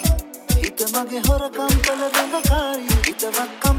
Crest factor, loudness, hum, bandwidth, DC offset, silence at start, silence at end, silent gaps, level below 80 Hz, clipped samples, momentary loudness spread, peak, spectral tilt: 18 dB; -20 LUFS; none; 19 kHz; under 0.1%; 0 s; 0 s; none; -24 dBFS; under 0.1%; 4 LU; -2 dBFS; -4 dB/octave